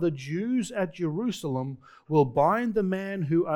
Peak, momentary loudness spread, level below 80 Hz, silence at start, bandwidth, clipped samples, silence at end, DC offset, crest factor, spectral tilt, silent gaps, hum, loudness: -10 dBFS; 8 LU; -60 dBFS; 0 s; 17 kHz; under 0.1%; 0 s; under 0.1%; 18 dB; -7 dB/octave; none; none; -27 LUFS